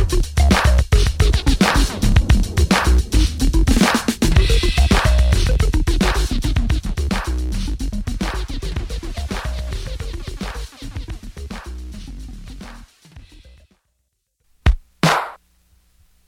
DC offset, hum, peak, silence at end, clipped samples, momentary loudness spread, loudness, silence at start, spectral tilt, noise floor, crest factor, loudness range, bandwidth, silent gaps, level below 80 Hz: under 0.1%; none; -2 dBFS; 0.9 s; under 0.1%; 17 LU; -19 LUFS; 0 s; -5 dB/octave; -71 dBFS; 16 dB; 17 LU; 16 kHz; none; -20 dBFS